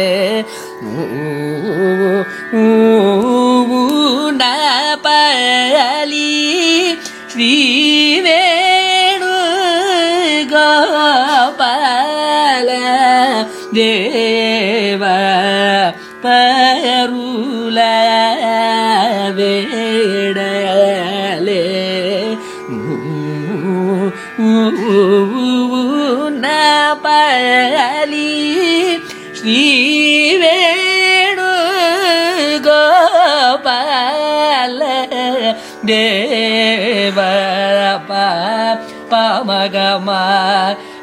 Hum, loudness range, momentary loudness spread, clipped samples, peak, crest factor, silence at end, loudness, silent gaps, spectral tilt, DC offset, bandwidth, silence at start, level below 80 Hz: none; 4 LU; 9 LU; under 0.1%; 0 dBFS; 12 dB; 0 s; -12 LUFS; none; -3.5 dB/octave; under 0.1%; 16 kHz; 0 s; -64 dBFS